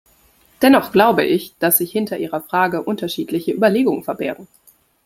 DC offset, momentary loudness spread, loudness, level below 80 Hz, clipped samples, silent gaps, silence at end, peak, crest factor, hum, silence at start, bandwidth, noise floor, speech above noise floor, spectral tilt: under 0.1%; 11 LU; -17 LUFS; -58 dBFS; under 0.1%; none; 0.6 s; 0 dBFS; 18 dB; none; 0.6 s; 16.5 kHz; -54 dBFS; 37 dB; -4.5 dB/octave